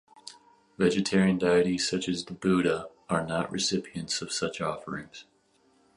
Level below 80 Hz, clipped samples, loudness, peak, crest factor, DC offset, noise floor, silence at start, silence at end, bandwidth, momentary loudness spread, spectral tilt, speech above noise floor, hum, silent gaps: -60 dBFS; under 0.1%; -28 LUFS; -12 dBFS; 18 dB; under 0.1%; -66 dBFS; 0.25 s; 0.75 s; 11.5 kHz; 16 LU; -4.5 dB/octave; 38 dB; none; none